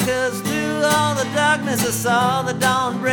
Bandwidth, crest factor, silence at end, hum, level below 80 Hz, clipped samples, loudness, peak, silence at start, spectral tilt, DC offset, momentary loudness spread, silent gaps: over 20 kHz; 14 dB; 0 s; none; -52 dBFS; under 0.1%; -19 LUFS; -4 dBFS; 0 s; -3.5 dB/octave; under 0.1%; 4 LU; none